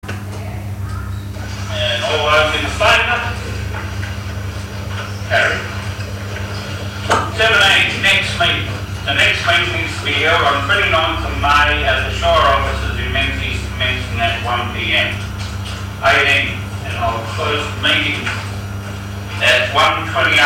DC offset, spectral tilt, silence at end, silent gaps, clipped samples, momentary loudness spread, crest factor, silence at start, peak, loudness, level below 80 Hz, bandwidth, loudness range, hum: under 0.1%; -4 dB/octave; 0 s; none; under 0.1%; 14 LU; 14 dB; 0.05 s; -4 dBFS; -15 LUFS; -30 dBFS; 16.5 kHz; 5 LU; none